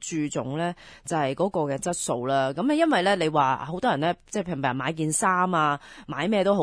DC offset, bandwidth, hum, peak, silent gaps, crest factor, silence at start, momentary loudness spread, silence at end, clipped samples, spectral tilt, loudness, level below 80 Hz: under 0.1%; 11 kHz; none; -8 dBFS; none; 16 dB; 0 s; 8 LU; 0 s; under 0.1%; -4.5 dB/octave; -25 LUFS; -58 dBFS